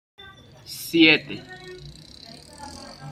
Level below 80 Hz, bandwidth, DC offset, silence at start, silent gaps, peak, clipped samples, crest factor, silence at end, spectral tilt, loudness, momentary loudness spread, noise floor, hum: -58 dBFS; 14.5 kHz; under 0.1%; 0.7 s; none; -2 dBFS; under 0.1%; 22 dB; 0 s; -4 dB/octave; -18 LUFS; 27 LU; -45 dBFS; none